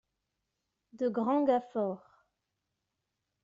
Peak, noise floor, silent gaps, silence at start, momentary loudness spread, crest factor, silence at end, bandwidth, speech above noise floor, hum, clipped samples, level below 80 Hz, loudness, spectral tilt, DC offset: -16 dBFS; -85 dBFS; none; 0.95 s; 8 LU; 20 dB; 1.45 s; 7.6 kHz; 55 dB; none; under 0.1%; -80 dBFS; -31 LUFS; -6.5 dB/octave; under 0.1%